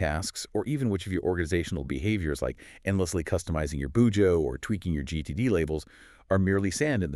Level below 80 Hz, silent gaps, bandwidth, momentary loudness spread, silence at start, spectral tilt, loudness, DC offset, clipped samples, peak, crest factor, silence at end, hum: -42 dBFS; none; 13 kHz; 8 LU; 0 s; -6 dB/octave; -28 LUFS; under 0.1%; under 0.1%; -12 dBFS; 16 dB; 0 s; none